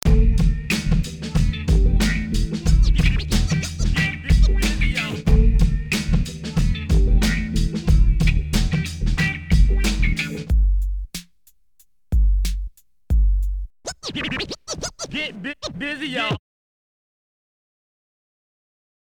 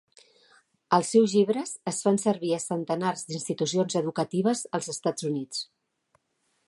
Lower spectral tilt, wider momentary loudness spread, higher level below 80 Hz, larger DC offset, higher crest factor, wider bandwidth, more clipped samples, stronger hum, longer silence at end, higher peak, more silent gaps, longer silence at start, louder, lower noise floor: about the same, -5 dB/octave vs -5 dB/octave; about the same, 10 LU vs 10 LU; first, -20 dBFS vs -76 dBFS; first, 0.2% vs under 0.1%; second, 16 dB vs 22 dB; first, 18 kHz vs 11.5 kHz; neither; neither; first, 2.65 s vs 1.05 s; about the same, -4 dBFS vs -6 dBFS; neither; second, 0.05 s vs 0.9 s; first, -22 LUFS vs -27 LUFS; second, -61 dBFS vs -74 dBFS